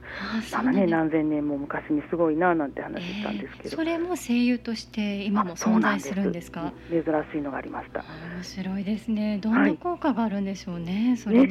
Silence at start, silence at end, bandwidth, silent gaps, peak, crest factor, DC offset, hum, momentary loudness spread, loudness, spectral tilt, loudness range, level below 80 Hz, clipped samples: 0 s; 0 s; 13.5 kHz; none; -8 dBFS; 16 dB; under 0.1%; 60 Hz at -50 dBFS; 12 LU; -26 LUFS; -6 dB/octave; 3 LU; -54 dBFS; under 0.1%